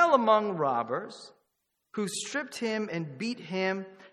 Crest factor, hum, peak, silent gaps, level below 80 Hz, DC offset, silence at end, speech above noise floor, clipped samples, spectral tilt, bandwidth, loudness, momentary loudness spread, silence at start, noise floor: 22 dB; none; -8 dBFS; none; -80 dBFS; under 0.1%; 0.05 s; 49 dB; under 0.1%; -4.5 dB/octave; 14 kHz; -30 LUFS; 12 LU; 0 s; -80 dBFS